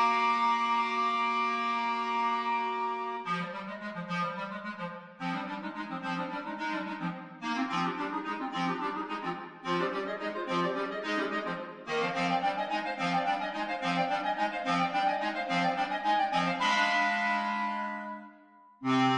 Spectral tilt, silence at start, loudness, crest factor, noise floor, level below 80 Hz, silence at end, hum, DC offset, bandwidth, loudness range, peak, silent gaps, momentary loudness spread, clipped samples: -5 dB/octave; 0 s; -31 LUFS; 16 dB; -57 dBFS; -74 dBFS; 0 s; none; under 0.1%; 10.5 kHz; 7 LU; -14 dBFS; none; 11 LU; under 0.1%